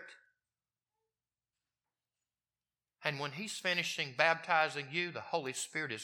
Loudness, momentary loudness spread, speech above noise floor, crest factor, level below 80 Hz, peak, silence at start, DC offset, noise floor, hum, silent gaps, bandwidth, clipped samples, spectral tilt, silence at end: -34 LUFS; 8 LU; over 54 dB; 28 dB; under -90 dBFS; -12 dBFS; 0 s; under 0.1%; under -90 dBFS; none; none; 17 kHz; under 0.1%; -2.5 dB/octave; 0 s